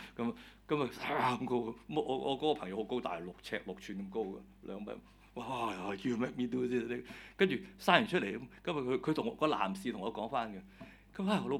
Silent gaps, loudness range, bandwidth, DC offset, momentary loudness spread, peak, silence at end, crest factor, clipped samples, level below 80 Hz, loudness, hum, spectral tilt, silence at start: none; 7 LU; 16 kHz; under 0.1%; 14 LU; -8 dBFS; 0 s; 28 dB; under 0.1%; -64 dBFS; -36 LUFS; none; -6 dB/octave; 0 s